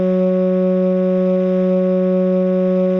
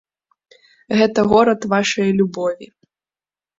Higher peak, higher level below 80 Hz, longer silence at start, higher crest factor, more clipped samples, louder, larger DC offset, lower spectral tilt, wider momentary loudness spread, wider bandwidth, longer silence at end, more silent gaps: second, -8 dBFS vs -2 dBFS; second, -66 dBFS vs -54 dBFS; second, 0 s vs 0.9 s; second, 8 dB vs 16 dB; neither; about the same, -16 LUFS vs -17 LUFS; neither; first, -11 dB/octave vs -5.5 dB/octave; second, 0 LU vs 10 LU; second, 4 kHz vs 7.8 kHz; second, 0 s vs 0.95 s; neither